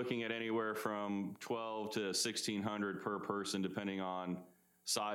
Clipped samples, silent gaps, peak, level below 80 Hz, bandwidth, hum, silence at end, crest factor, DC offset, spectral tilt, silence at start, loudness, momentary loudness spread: under 0.1%; none; -20 dBFS; -86 dBFS; 17 kHz; none; 0 s; 18 dB; under 0.1%; -3.5 dB/octave; 0 s; -40 LUFS; 6 LU